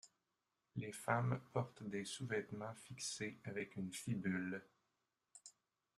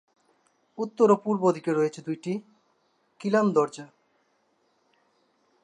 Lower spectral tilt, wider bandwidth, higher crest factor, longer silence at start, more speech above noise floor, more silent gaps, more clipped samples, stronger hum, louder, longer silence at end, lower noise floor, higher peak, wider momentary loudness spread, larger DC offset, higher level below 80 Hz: second, -5 dB/octave vs -7 dB/octave; first, 13.5 kHz vs 10 kHz; first, 26 dB vs 20 dB; second, 0.05 s vs 0.8 s; about the same, 45 dB vs 45 dB; neither; neither; neither; second, -45 LUFS vs -26 LUFS; second, 0.45 s vs 1.8 s; first, -89 dBFS vs -70 dBFS; second, -20 dBFS vs -8 dBFS; about the same, 12 LU vs 14 LU; neither; about the same, -78 dBFS vs -82 dBFS